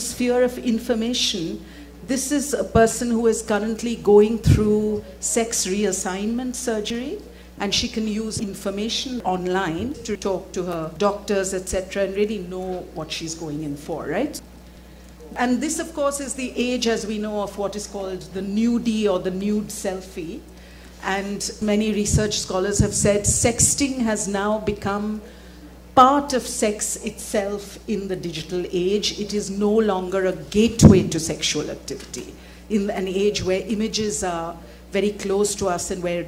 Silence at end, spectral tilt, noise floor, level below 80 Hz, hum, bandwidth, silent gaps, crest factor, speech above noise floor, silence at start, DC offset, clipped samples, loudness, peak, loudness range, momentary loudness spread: 0 s; -4.5 dB/octave; -43 dBFS; -40 dBFS; none; 16.5 kHz; none; 22 dB; 21 dB; 0 s; under 0.1%; under 0.1%; -22 LUFS; 0 dBFS; 6 LU; 12 LU